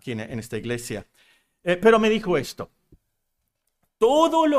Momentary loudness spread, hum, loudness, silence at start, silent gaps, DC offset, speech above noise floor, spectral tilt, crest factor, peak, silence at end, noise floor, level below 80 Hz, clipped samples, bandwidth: 17 LU; none; -22 LUFS; 0.05 s; none; under 0.1%; 55 dB; -5 dB/octave; 20 dB; -4 dBFS; 0 s; -76 dBFS; -52 dBFS; under 0.1%; 15.5 kHz